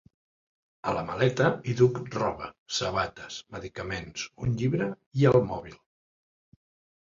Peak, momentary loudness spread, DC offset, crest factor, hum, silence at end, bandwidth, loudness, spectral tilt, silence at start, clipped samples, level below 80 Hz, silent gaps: -6 dBFS; 15 LU; under 0.1%; 22 dB; none; 1.25 s; 7.6 kHz; -28 LUFS; -6 dB/octave; 0.85 s; under 0.1%; -54 dBFS; 2.58-2.66 s, 5.06-5.11 s